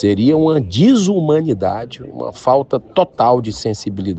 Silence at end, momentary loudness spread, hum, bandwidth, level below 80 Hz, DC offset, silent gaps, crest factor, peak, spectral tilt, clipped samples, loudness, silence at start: 0 s; 11 LU; none; 8.6 kHz; -48 dBFS; under 0.1%; none; 14 dB; -2 dBFS; -7 dB/octave; under 0.1%; -15 LUFS; 0 s